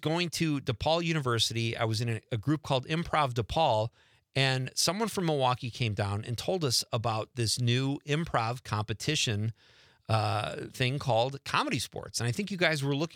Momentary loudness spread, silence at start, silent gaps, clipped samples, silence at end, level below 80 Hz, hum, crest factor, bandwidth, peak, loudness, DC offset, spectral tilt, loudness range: 6 LU; 0 s; none; under 0.1%; 0 s; -58 dBFS; none; 20 dB; 16.5 kHz; -10 dBFS; -30 LUFS; under 0.1%; -4.5 dB/octave; 2 LU